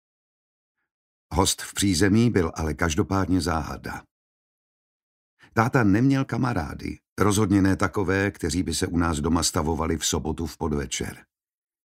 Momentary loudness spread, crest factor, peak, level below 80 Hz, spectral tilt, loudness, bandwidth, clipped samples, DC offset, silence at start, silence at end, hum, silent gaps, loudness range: 10 LU; 22 dB; -2 dBFS; -40 dBFS; -5 dB/octave; -24 LUFS; 16 kHz; under 0.1%; under 0.1%; 1.3 s; 0.7 s; none; 4.11-5.37 s, 7.09-7.16 s; 3 LU